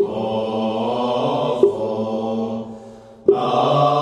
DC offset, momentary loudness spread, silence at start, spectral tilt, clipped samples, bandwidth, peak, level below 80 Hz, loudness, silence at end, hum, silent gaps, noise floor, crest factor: under 0.1%; 9 LU; 0 s; -7.5 dB/octave; under 0.1%; 9.8 kHz; -2 dBFS; -58 dBFS; -20 LUFS; 0 s; none; none; -40 dBFS; 18 dB